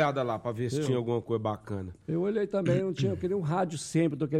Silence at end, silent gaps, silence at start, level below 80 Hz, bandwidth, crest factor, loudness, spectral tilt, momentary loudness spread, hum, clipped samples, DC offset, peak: 0 s; none; 0 s; -62 dBFS; 13.5 kHz; 14 dB; -30 LUFS; -7 dB/octave; 6 LU; none; under 0.1%; under 0.1%; -14 dBFS